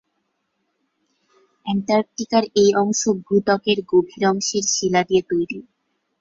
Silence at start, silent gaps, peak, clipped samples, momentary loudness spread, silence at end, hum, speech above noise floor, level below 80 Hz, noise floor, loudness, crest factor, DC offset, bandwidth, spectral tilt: 1.65 s; none; -4 dBFS; under 0.1%; 8 LU; 0.6 s; none; 53 dB; -62 dBFS; -72 dBFS; -19 LUFS; 16 dB; under 0.1%; 7.8 kHz; -4 dB/octave